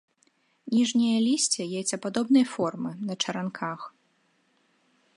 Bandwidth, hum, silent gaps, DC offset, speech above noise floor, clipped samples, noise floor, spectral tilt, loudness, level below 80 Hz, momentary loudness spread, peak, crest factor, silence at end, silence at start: 11.5 kHz; none; none; under 0.1%; 43 dB; under 0.1%; -69 dBFS; -3.5 dB/octave; -26 LUFS; -76 dBFS; 12 LU; -10 dBFS; 18 dB; 1.25 s; 0.65 s